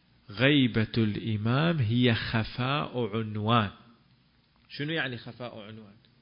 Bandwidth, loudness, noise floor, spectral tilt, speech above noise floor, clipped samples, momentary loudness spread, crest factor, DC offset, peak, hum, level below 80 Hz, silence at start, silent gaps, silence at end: 5.4 kHz; -28 LUFS; -65 dBFS; -10.5 dB/octave; 37 dB; under 0.1%; 17 LU; 20 dB; under 0.1%; -8 dBFS; none; -54 dBFS; 0.3 s; none; 0.35 s